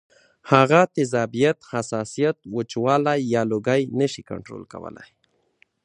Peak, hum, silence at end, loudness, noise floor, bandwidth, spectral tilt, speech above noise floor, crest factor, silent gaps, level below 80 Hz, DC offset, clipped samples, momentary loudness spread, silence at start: 0 dBFS; none; 0.8 s; -21 LUFS; -63 dBFS; 10.5 kHz; -6 dB/octave; 41 dB; 22 dB; none; -62 dBFS; under 0.1%; under 0.1%; 18 LU; 0.45 s